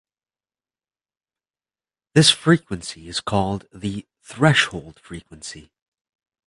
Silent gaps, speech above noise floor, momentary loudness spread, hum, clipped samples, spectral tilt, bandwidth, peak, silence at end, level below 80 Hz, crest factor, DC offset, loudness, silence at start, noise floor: none; over 69 dB; 22 LU; none; under 0.1%; -4 dB/octave; 11.5 kHz; -2 dBFS; 0.85 s; -50 dBFS; 22 dB; under 0.1%; -19 LUFS; 2.15 s; under -90 dBFS